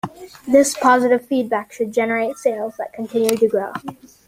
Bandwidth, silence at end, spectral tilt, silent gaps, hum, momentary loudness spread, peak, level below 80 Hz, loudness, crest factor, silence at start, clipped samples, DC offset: 16 kHz; 0.35 s; -4 dB/octave; none; none; 15 LU; 0 dBFS; -62 dBFS; -18 LUFS; 18 dB; 0.05 s; under 0.1%; under 0.1%